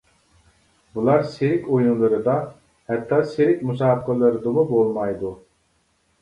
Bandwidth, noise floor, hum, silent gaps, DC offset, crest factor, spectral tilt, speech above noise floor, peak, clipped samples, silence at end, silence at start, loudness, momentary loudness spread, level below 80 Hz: 10.5 kHz; -65 dBFS; none; none; under 0.1%; 16 dB; -9 dB/octave; 46 dB; -4 dBFS; under 0.1%; 0.85 s; 0.95 s; -21 LUFS; 9 LU; -56 dBFS